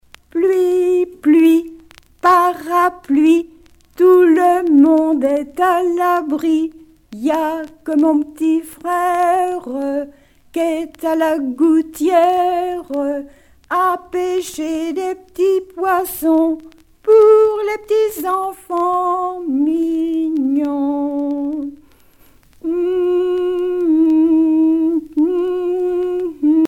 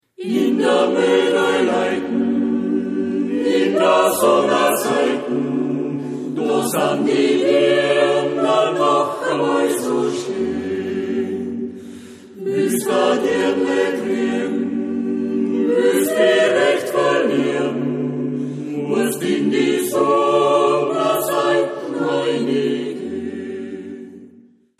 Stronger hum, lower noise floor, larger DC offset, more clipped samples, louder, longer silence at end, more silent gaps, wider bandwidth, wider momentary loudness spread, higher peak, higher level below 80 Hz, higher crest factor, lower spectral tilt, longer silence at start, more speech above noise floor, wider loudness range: neither; about the same, -48 dBFS vs -49 dBFS; neither; neither; about the same, -16 LUFS vs -18 LUFS; second, 0 s vs 0.55 s; neither; about the same, 16.5 kHz vs 15 kHz; about the same, 10 LU vs 10 LU; about the same, 0 dBFS vs -2 dBFS; first, -54 dBFS vs -64 dBFS; about the same, 14 dB vs 16 dB; about the same, -4.5 dB/octave vs -4.5 dB/octave; first, 0.35 s vs 0.2 s; about the same, 33 dB vs 32 dB; about the same, 6 LU vs 4 LU